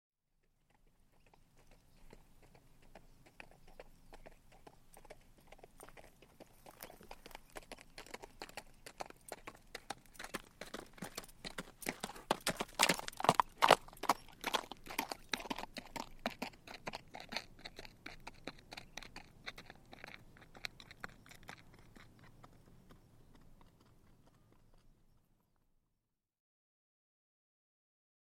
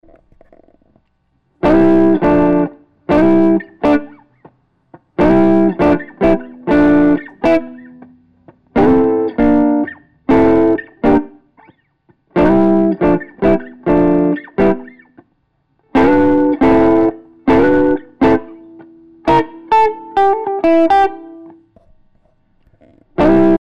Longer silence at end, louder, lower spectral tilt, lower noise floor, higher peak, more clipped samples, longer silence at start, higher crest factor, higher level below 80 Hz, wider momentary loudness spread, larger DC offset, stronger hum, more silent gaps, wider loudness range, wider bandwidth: first, 3.45 s vs 0.05 s; second, -40 LUFS vs -13 LUFS; second, -2.5 dB/octave vs -8.5 dB/octave; first, -87 dBFS vs -62 dBFS; about the same, -6 dBFS vs -4 dBFS; neither; first, 1.55 s vs 0.05 s; first, 38 dB vs 10 dB; second, -64 dBFS vs -36 dBFS; first, 28 LU vs 8 LU; second, under 0.1% vs 2%; neither; neither; first, 26 LU vs 2 LU; first, 16.5 kHz vs 6.4 kHz